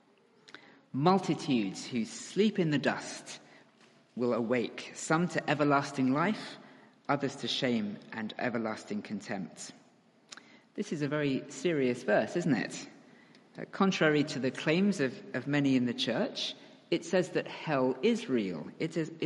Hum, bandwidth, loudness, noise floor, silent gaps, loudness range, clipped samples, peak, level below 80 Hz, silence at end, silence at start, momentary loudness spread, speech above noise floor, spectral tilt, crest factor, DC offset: none; 11.5 kHz; -31 LUFS; -64 dBFS; none; 5 LU; under 0.1%; -12 dBFS; -78 dBFS; 0 s; 0.95 s; 16 LU; 33 dB; -5.5 dB/octave; 20 dB; under 0.1%